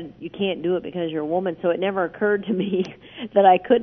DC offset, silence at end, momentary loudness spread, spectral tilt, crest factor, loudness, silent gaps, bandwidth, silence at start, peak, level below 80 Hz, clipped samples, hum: under 0.1%; 0 s; 11 LU; -8 dB/octave; 18 dB; -22 LUFS; none; 6.2 kHz; 0 s; -4 dBFS; -60 dBFS; under 0.1%; none